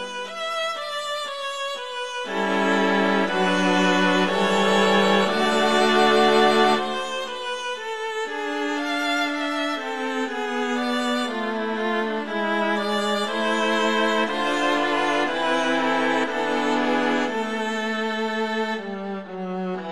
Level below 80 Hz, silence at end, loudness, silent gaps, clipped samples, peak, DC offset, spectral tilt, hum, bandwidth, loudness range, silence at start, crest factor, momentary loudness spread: -68 dBFS; 0 s; -22 LUFS; none; under 0.1%; -4 dBFS; 0.6%; -4 dB/octave; none; 14 kHz; 6 LU; 0 s; 18 dB; 10 LU